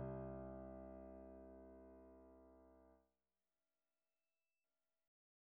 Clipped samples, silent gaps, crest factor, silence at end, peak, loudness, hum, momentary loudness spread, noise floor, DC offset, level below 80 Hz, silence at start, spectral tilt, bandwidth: under 0.1%; none; 20 dB; 2.5 s; -38 dBFS; -57 LUFS; none; 16 LU; under -90 dBFS; under 0.1%; -68 dBFS; 0 s; -7 dB/octave; 3.2 kHz